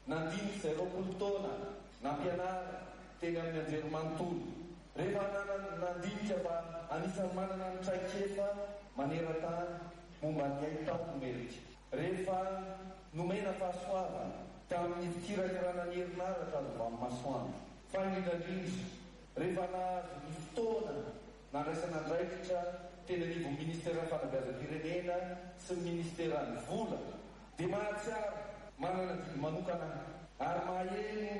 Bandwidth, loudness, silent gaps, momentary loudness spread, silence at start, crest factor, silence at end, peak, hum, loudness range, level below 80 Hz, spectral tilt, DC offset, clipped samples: 11.5 kHz; -40 LUFS; none; 9 LU; 0 s; 14 dB; 0 s; -26 dBFS; none; 1 LU; -62 dBFS; -6.5 dB/octave; under 0.1%; under 0.1%